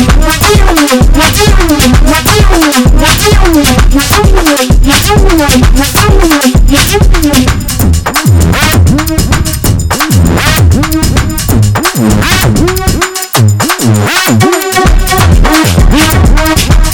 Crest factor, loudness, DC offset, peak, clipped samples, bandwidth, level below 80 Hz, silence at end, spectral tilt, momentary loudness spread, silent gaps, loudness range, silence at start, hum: 6 dB; -7 LUFS; under 0.1%; 0 dBFS; 6%; 19 kHz; -10 dBFS; 0 s; -4.5 dB/octave; 4 LU; none; 2 LU; 0 s; none